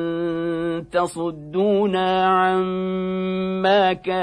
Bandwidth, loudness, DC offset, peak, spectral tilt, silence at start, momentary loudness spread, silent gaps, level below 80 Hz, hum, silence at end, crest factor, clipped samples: 11 kHz; -21 LUFS; under 0.1%; -8 dBFS; -6.5 dB/octave; 0 s; 7 LU; none; -54 dBFS; none; 0 s; 14 dB; under 0.1%